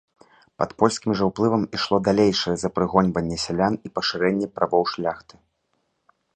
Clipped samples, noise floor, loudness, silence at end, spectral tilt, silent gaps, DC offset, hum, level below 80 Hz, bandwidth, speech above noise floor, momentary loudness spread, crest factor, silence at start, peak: under 0.1%; -72 dBFS; -22 LUFS; 1.15 s; -5.5 dB/octave; none; under 0.1%; none; -52 dBFS; 9.2 kHz; 50 dB; 7 LU; 22 dB; 0.6 s; -2 dBFS